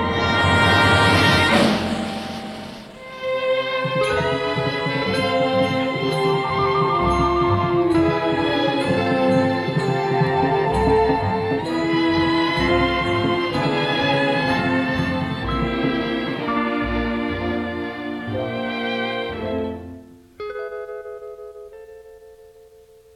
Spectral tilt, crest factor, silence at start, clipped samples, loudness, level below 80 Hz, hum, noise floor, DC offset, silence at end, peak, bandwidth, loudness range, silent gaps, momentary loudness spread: -6 dB/octave; 18 dB; 0 s; under 0.1%; -20 LUFS; -40 dBFS; none; -49 dBFS; under 0.1%; 0.75 s; -2 dBFS; 13.5 kHz; 8 LU; none; 15 LU